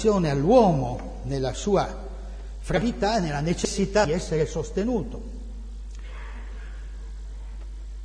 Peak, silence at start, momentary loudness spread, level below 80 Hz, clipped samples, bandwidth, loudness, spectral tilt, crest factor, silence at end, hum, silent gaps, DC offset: -4 dBFS; 0 s; 18 LU; -36 dBFS; under 0.1%; 10.5 kHz; -24 LUFS; -6 dB/octave; 20 dB; 0 s; none; none; under 0.1%